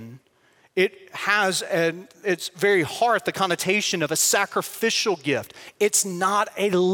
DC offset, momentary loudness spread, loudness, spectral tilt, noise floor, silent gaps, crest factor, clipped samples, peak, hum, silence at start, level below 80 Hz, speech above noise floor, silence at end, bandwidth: under 0.1%; 6 LU; -22 LUFS; -2.5 dB/octave; -60 dBFS; none; 18 dB; under 0.1%; -6 dBFS; none; 0 s; -70 dBFS; 37 dB; 0 s; 17 kHz